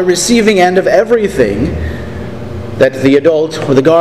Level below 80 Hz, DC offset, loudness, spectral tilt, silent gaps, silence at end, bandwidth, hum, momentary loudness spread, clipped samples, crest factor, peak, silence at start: -30 dBFS; 1%; -10 LUFS; -5 dB/octave; none; 0 s; 15 kHz; none; 15 LU; 0.6%; 10 dB; 0 dBFS; 0 s